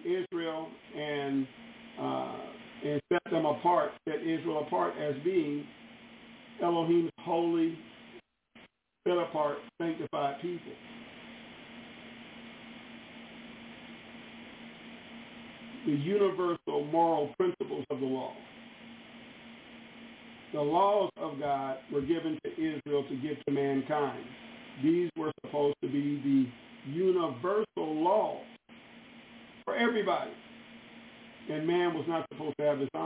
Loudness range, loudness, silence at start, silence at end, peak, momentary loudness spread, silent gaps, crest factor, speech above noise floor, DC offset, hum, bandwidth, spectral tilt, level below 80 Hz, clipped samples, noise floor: 10 LU; -32 LUFS; 0 s; 0 s; -14 dBFS; 21 LU; none; 18 dB; 29 dB; under 0.1%; none; 4 kHz; -5 dB/octave; -72 dBFS; under 0.1%; -60 dBFS